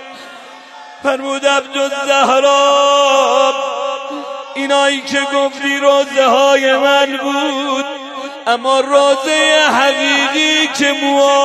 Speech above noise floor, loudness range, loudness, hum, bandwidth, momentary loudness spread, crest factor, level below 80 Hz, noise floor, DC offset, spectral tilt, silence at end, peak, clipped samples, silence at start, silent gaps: 22 dB; 2 LU; -12 LUFS; none; 13 kHz; 11 LU; 12 dB; -70 dBFS; -35 dBFS; under 0.1%; -1 dB/octave; 0 s; 0 dBFS; under 0.1%; 0 s; none